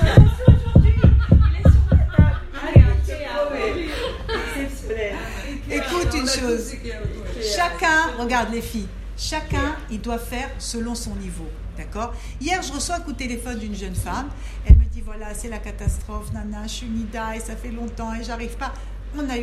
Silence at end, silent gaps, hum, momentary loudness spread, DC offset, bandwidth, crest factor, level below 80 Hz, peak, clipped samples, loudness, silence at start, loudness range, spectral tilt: 0 s; none; none; 16 LU; under 0.1%; 13.5 kHz; 20 dB; -24 dBFS; 0 dBFS; under 0.1%; -21 LUFS; 0 s; 12 LU; -6 dB/octave